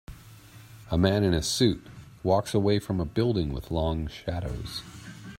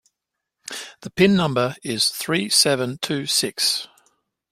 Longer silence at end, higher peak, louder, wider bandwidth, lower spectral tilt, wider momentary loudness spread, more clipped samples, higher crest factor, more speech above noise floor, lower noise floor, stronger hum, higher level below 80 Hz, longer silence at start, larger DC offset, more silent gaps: second, 0.05 s vs 0.65 s; second, -8 dBFS vs -2 dBFS; second, -27 LUFS vs -20 LUFS; about the same, 16 kHz vs 16 kHz; first, -5.5 dB/octave vs -3 dB/octave; second, 14 LU vs 17 LU; neither; about the same, 20 dB vs 20 dB; second, 23 dB vs 61 dB; second, -49 dBFS vs -82 dBFS; neither; first, -44 dBFS vs -58 dBFS; second, 0.1 s vs 0.7 s; neither; neither